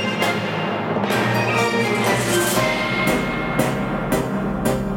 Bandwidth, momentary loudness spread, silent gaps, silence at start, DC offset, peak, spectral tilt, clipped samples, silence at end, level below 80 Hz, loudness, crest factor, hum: 17 kHz; 4 LU; none; 0 s; under 0.1%; -4 dBFS; -4.5 dB/octave; under 0.1%; 0 s; -40 dBFS; -20 LUFS; 16 dB; none